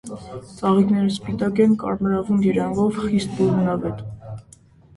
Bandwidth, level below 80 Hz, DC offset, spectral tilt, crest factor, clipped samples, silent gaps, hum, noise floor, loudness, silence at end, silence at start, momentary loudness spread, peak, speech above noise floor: 11.5 kHz; -50 dBFS; under 0.1%; -7.5 dB/octave; 16 dB; under 0.1%; none; none; -50 dBFS; -20 LUFS; 0.55 s; 0.05 s; 17 LU; -6 dBFS; 30 dB